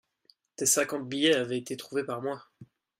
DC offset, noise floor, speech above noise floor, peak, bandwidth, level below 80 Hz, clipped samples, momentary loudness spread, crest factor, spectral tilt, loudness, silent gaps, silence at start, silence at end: under 0.1%; -66 dBFS; 37 dB; -12 dBFS; 16 kHz; -76 dBFS; under 0.1%; 10 LU; 20 dB; -2.5 dB/octave; -28 LUFS; none; 0.6 s; 0.35 s